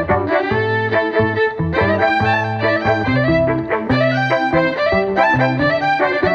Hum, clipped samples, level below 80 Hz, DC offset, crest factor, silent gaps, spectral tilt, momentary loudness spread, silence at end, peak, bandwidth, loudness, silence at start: none; under 0.1%; -40 dBFS; under 0.1%; 14 dB; none; -7.5 dB/octave; 3 LU; 0 s; -2 dBFS; 7.6 kHz; -16 LUFS; 0 s